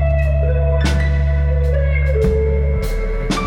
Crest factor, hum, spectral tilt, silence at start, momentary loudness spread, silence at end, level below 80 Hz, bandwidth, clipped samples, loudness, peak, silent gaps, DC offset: 10 dB; none; -7 dB/octave; 0 s; 5 LU; 0 s; -18 dBFS; 10.5 kHz; under 0.1%; -17 LUFS; -6 dBFS; none; under 0.1%